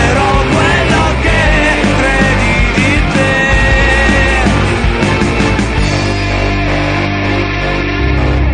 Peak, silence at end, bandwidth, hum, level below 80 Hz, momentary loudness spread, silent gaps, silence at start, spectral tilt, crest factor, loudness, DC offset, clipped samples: 0 dBFS; 0 s; 10.5 kHz; 50 Hz at -30 dBFS; -16 dBFS; 4 LU; none; 0 s; -5.5 dB/octave; 10 dB; -11 LUFS; under 0.1%; under 0.1%